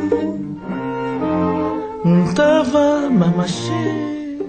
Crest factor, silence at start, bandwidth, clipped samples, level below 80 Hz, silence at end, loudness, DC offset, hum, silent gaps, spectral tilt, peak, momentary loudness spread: 16 dB; 0 s; 9 kHz; under 0.1%; -48 dBFS; 0 s; -18 LUFS; under 0.1%; none; none; -7 dB/octave; -2 dBFS; 10 LU